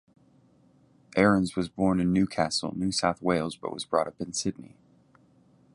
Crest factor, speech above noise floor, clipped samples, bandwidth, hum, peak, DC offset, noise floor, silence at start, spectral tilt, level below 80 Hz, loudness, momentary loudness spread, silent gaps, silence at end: 22 dB; 34 dB; under 0.1%; 11.5 kHz; none; -8 dBFS; under 0.1%; -61 dBFS; 1.15 s; -5 dB/octave; -54 dBFS; -27 LUFS; 10 LU; none; 1.1 s